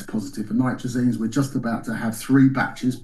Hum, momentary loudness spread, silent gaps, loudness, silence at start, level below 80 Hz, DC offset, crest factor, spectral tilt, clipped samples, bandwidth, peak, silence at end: none; 10 LU; none; -22 LUFS; 0 s; -46 dBFS; under 0.1%; 16 dB; -6.5 dB/octave; under 0.1%; 12.5 kHz; -6 dBFS; 0 s